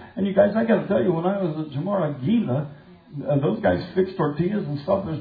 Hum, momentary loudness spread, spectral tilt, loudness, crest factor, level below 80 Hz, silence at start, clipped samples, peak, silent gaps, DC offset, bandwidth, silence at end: none; 8 LU; -11 dB/octave; -23 LUFS; 16 dB; -56 dBFS; 0 s; under 0.1%; -6 dBFS; none; under 0.1%; 5 kHz; 0 s